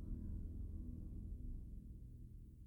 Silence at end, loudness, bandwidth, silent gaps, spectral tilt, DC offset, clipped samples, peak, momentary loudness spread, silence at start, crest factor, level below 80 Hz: 0 s; -53 LUFS; 1.6 kHz; none; -10.5 dB/octave; under 0.1%; under 0.1%; -36 dBFS; 8 LU; 0 s; 12 dB; -50 dBFS